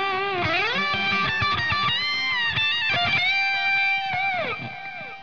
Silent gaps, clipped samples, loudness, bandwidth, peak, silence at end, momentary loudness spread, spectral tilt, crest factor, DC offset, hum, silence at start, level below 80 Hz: none; under 0.1%; -21 LUFS; 5.4 kHz; -12 dBFS; 0 s; 7 LU; -3.5 dB/octave; 12 dB; 0.6%; none; 0 s; -52 dBFS